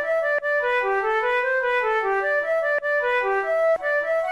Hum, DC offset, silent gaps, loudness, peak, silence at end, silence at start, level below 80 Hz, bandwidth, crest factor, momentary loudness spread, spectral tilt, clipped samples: none; 0.1%; none; -22 LUFS; -14 dBFS; 0 s; 0 s; -58 dBFS; 12.5 kHz; 8 dB; 1 LU; -3 dB/octave; under 0.1%